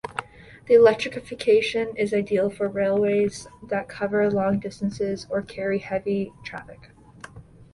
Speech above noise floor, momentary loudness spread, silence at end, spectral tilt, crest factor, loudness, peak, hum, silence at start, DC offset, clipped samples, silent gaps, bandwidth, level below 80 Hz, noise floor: 22 dB; 17 LU; 0.3 s; -6 dB/octave; 18 dB; -23 LUFS; -6 dBFS; none; 0.05 s; under 0.1%; under 0.1%; none; 11.5 kHz; -56 dBFS; -45 dBFS